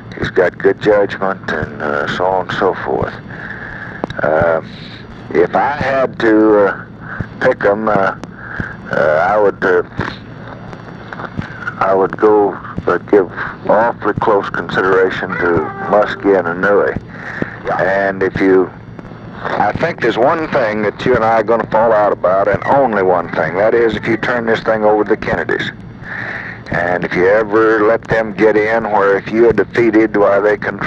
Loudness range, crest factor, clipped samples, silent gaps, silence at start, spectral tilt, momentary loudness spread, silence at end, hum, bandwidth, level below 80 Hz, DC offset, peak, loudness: 4 LU; 14 dB; under 0.1%; none; 0 s; -7 dB/octave; 14 LU; 0 s; none; 7.8 kHz; -42 dBFS; under 0.1%; 0 dBFS; -14 LUFS